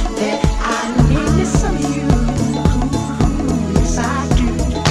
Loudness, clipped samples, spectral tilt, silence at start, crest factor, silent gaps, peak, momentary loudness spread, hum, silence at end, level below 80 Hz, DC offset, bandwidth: -17 LUFS; under 0.1%; -6 dB/octave; 0 s; 14 dB; none; -2 dBFS; 4 LU; none; 0 s; -20 dBFS; under 0.1%; 12 kHz